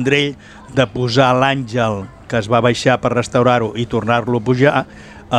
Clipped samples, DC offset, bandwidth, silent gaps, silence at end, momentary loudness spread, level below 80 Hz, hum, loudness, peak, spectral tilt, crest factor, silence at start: under 0.1%; under 0.1%; 10.5 kHz; none; 0 s; 9 LU; -46 dBFS; none; -16 LUFS; 0 dBFS; -6 dB/octave; 16 dB; 0 s